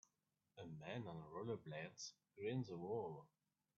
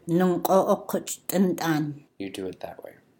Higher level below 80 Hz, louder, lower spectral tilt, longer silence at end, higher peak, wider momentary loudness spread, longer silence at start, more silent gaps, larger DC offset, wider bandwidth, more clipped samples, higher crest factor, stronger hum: second, -84 dBFS vs -66 dBFS; second, -51 LUFS vs -25 LUFS; about the same, -5.5 dB/octave vs -6 dB/octave; first, 0.5 s vs 0.3 s; second, -34 dBFS vs -6 dBFS; second, 11 LU vs 17 LU; first, 0.55 s vs 0.05 s; neither; neither; second, 7.2 kHz vs 17 kHz; neither; about the same, 16 dB vs 20 dB; neither